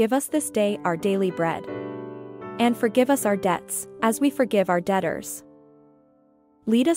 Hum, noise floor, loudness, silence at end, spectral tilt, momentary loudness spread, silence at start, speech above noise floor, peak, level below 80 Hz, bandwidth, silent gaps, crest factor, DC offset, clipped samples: none; -60 dBFS; -24 LUFS; 0 s; -5 dB/octave; 14 LU; 0 s; 37 dB; -6 dBFS; -64 dBFS; 16 kHz; none; 18 dB; under 0.1%; under 0.1%